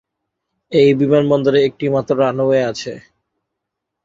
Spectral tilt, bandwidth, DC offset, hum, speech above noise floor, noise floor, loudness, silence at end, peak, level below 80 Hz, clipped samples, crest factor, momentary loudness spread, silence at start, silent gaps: -7 dB/octave; 7.6 kHz; under 0.1%; none; 64 dB; -79 dBFS; -15 LUFS; 1.05 s; -2 dBFS; -56 dBFS; under 0.1%; 16 dB; 8 LU; 0.7 s; none